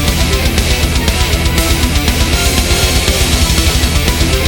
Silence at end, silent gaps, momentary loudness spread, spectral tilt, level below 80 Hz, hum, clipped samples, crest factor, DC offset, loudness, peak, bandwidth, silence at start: 0 s; none; 2 LU; -3.5 dB/octave; -14 dBFS; none; under 0.1%; 12 dB; 0.3%; -12 LUFS; 0 dBFS; 18 kHz; 0 s